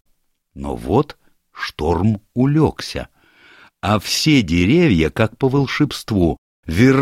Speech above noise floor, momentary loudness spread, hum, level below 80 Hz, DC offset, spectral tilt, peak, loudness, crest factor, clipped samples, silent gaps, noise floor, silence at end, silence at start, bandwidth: 32 dB; 14 LU; none; -36 dBFS; under 0.1%; -6 dB/octave; -2 dBFS; -18 LUFS; 16 dB; under 0.1%; 6.38-6.63 s; -49 dBFS; 0 s; 0.55 s; 15.5 kHz